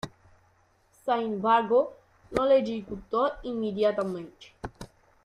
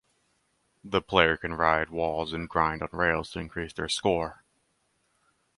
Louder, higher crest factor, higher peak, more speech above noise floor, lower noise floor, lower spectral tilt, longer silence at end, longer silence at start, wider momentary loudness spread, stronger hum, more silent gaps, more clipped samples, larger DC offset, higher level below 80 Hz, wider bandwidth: about the same, -27 LUFS vs -27 LUFS; second, 20 dB vs 28 dB; second, -8 dBFS vs -2 dBFS; second, 38 dB vs 45 dB; second, -65 dBFS vs -72 dBFS; first, -6.5 dB/octave vs -4.5 dB/octave; second, 0.4 s vs 1.25 s; second, 0.05 s vs 0.85 s; first, 20 LU vs 11 LU; neither; neither; neither; neither; second, -56 dBFS vs -50 dBFS; about the same, 11.5 kHz vs 11.5 kHz